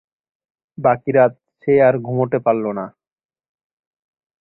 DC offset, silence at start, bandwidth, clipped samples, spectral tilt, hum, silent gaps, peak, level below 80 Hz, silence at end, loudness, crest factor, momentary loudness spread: under 0.1%; 0.8 s; 4.1 kHz; under 0.1%; -12.5 dB/octave; none; none; -2 dBFS; -60 dBFS; 1.55 s; -17 LUFS; 18 dB; 13 LU